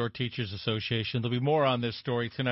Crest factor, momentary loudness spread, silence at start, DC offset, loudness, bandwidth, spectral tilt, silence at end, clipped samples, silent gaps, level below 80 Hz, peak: 16 dB; 7 LU; 0 s; under 0.1%; -30 LUFS; 5.8 kHz; -9.5 dB/octave; 0 s; under 0.1%; none; -58 dBFS; -14 dBFS